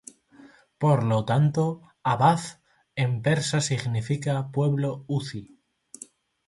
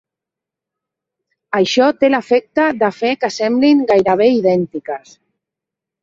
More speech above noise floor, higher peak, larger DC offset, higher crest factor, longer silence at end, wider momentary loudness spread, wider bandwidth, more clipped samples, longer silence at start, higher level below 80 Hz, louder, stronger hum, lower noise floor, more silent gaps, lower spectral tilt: second, 29 dB vs 71 dB; second, -8 dBFS vs -2 dBFS; neither; about the same, 18 dB vs 14 dB; about the same, 1.05 s vs 1.05 s; first, 17 LU vs 10 LU; first, 11.5 kHz vs 7.8 kHz; neither; second, 0.4 s vs 1.5 s; about the same, -60 dBFS vs -58 dBFS; second, -25 LUFS vs -14 LUFS; neither; second, -53 dBFS vs -85 dBFS; neither; about the same, -6 dB/octave vs -5 dB/octave